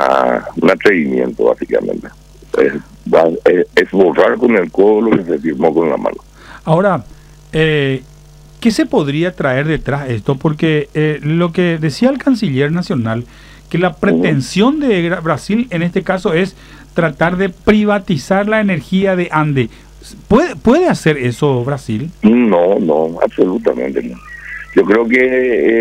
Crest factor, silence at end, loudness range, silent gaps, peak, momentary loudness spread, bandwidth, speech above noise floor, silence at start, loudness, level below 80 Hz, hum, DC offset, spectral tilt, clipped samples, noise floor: 14 dB; 0 s; 3 LU; none; 0 dBFS; 9 LU; 15 kHz; 26 dB; 0 s; -14 LUFS; -40 dBFS; none; under 0.1%; -7 dB/octave; under 0.1%; -39 dBFS